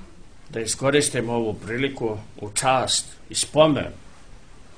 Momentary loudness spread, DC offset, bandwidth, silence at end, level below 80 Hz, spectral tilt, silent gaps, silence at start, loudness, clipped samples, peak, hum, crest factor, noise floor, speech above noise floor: 11 LU; 0.6%; 10.5 kHz; 0.15 s; -48 dBFS; -3.5 dB/octave; none; 0 s; -22 LUFS; under 0.1%; -2 dBFS; none; 22 dB; -46 dBFS; 24 dB